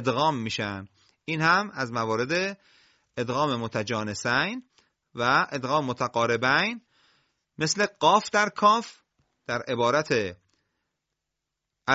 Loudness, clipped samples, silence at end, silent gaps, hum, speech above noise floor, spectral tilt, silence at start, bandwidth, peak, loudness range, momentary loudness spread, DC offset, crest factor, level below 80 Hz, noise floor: -25 LUFS; under 0.1%; 0 s; none; none; 59 dB; -4 dB/octave; 0 s; 8 kHz; -6 dBFS; 4 LU; 13 LU; under 0.1%; 22 dB; -62 dBFS; -84 dBFS